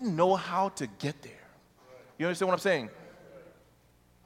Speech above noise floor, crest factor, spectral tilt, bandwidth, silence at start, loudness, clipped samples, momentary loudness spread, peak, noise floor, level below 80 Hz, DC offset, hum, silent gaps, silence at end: 34 dB; 22 dB; -5.5 dB/octave; 16.5 kHz; 0 s; -30 LUFS; under 0.1%; 25 LU; -10 dBFS; -63 dBFS; -70 dBFS; under 0.1%; none; none; 0.8 s